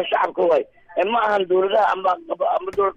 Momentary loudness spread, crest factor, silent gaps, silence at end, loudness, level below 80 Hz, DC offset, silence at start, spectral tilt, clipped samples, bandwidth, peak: 5 LU; 12 dB; none; 0 s; -20 LUFS; -60 dBFS; under 0.1%; 0 s; -5.5 dB/octave; under 0.1%; 7.6 kHz; -8 dBFS